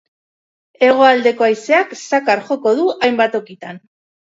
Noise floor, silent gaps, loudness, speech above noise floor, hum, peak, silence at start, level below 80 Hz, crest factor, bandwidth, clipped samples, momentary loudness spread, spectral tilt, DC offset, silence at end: under -90 dBFS; none; -14 LUFS; over 76 dB; none; 0 dBFS; 0.8 s; -66 dBFS; 16 dB; 7.8 kHz; under 0.1%; 13 LU; -4 dB/octave; under 0.1%; 0.55 s